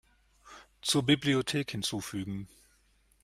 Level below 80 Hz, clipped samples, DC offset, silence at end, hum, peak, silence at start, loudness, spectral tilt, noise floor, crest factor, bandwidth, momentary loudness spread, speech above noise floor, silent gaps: -62 dBFS; under 0.1%; under 0.1%; 0.75 s; none; -12 dBFS; 0.45 s; -30 LUFS; -4 dB/octave; -67 dBFS; 22 dB; 15.5 kHz; 14 LU; 37 dB; none